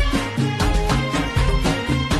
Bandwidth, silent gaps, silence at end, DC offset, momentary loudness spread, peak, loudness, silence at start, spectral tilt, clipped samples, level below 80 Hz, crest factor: 13 kHz; none; 0 s; under 0.1%; 2 LU; -8 dBFS; -21 LUFS; 0 s; -5.5 dB/octave; under 0.1%; -24 dBFS; 12 dB